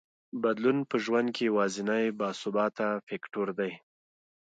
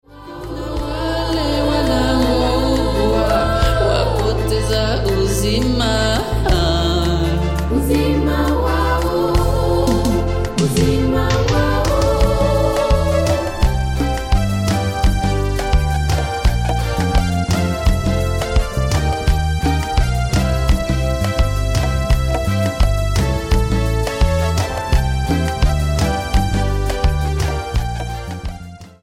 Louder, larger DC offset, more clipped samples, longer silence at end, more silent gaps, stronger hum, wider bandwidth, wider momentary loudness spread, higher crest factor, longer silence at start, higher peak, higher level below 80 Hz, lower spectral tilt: second, -30 LUFS vs -18 LUFS; neither; neither; first, 0.8 s vs 0.15 s; first, 3.03-3.07 s vs none; neither; second, 9.2 kHz vs 16 kHz; first, 8 LU vs 4 LU; about the same, 16 dB vs 12 dB; first, 0.35 s vs 0.15 s; second, -14 dBFS vs -4 dBFS; second, -80 dBFS vs -20 dBFS; about the same, -5.5 dB/octave vs -6 dB/octave